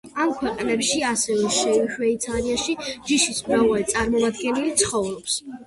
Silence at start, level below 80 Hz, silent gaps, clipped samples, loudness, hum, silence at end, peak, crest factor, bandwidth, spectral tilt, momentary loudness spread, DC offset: 0.05 s; -48 dBFS; none; under 0.1%; -22 LUFS; none; 0.05 s; -6 dBFS; 18 dB; 12 kHz; -2.5 dB/octave; 6 LU; under 0.1%